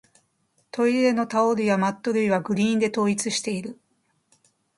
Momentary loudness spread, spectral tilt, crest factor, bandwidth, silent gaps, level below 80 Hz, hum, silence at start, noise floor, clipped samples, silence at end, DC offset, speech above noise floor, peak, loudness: 8 LU; -5 dB/octave; 16 dB; 11.5 kHz; none; -68 dBFS; none; 0.75 s; -70 dBFS; under 0.1%; 1.05 s; under 0.1%; 47 dB; -8 dBFS; -23 LUFS